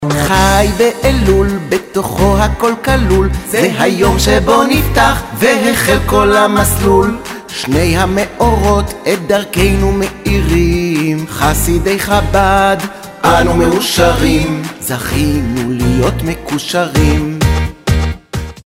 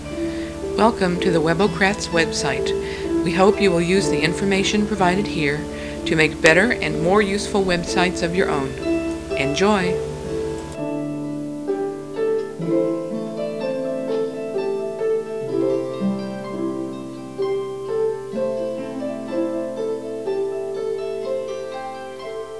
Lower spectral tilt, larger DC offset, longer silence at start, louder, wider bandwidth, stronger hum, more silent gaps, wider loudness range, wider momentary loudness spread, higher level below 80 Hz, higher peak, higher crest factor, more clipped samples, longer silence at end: about the same, -5 dB/octave vs -5 dB/octave; second, under 0.1% vs 0.4%; about the same, 0 s vs 0 s; first, -12 LUFS vs -21 LUFS; first, 16.5 kHz vs 11 kHz; neither; neither; second, 3 LU vs 7 LU; second, 7 LU vs 10 LU; first, -20 dBFS vs -42 dBFS; about the same, 0 dBFS vs 0 dBFS; second, 12 dB vs 22 dB; neither; first, 0.15 s vs 0 s